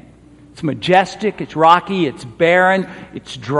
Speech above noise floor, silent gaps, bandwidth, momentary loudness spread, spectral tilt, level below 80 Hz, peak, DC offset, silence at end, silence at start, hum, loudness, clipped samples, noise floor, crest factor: 28 dB; none; 11.5 kHz; 17 LU; -5.5 dB/octave; -52 dBFS; 0 dBFS; under 0.1%; 0 s; 0.55 s; none; -15 LUFS; under 0.1%; -44 dBFS; 16 dB